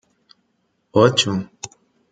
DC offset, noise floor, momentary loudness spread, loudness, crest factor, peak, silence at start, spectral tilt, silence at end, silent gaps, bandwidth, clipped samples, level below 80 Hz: under 0.1%; -68 dBFS; 21 LU; -18 LUFS; 20 dB; -2 dBFS; 0.95 s; -4.5 dB/octave; 0.45 s; none; 9.6 kHz; under 0.1%; -58 dBFS